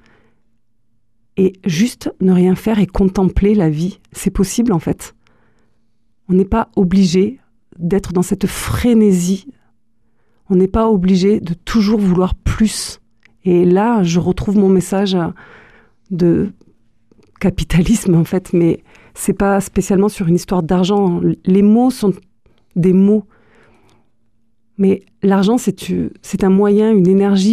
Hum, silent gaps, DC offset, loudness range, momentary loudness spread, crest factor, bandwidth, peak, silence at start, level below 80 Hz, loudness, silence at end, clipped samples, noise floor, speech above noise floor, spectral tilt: none; none; 0.2%; 4 LU; 9 LU; 12 dB; 14.5 kHz; -2 dBFS; 1.35 s; -32 dBFS; -15 LUFS; 0 s; under 0.1%; -66 dBFS; 52 dB; -7 dB/octave